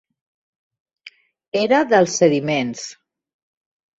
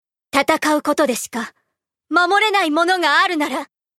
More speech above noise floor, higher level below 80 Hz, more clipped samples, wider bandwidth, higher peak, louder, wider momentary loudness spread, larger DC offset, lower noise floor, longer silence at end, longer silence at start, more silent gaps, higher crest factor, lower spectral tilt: second, 30 dB vs 59 dB; about the same, -66 dBFS vs -64 dBFS; neither; second, 8 kHz vs 16.5 kHz; about the same, -2 dBFS vs 0 dBFS; about the same, -18 LUFS vs -17 LUFS; about the same, 14 LU vs 12 LU; neither; second, -47 dBFS vs -76 dBFS; first, 1.05 s vs 0.35 s; first, 1.05 s vs 0.35 s; first, 1.48-1.52 s vs none; about the same, 20 dB vs 18 dB; first, -4.5 dB/octave vs -2 dB/octave